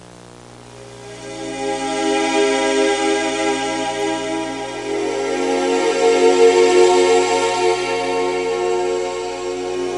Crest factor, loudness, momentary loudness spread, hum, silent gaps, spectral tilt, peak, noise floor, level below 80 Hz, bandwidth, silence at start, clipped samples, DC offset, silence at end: 16 dB; -17 LUFS; 13 LU; 60 Hz at -45 dBFS; none; -3 dB/octave; -2 dBFS; -40 dBFS; -54 dBFS; 11.5 kHz; 0 s; under 0.1%; 0.2%; 0 s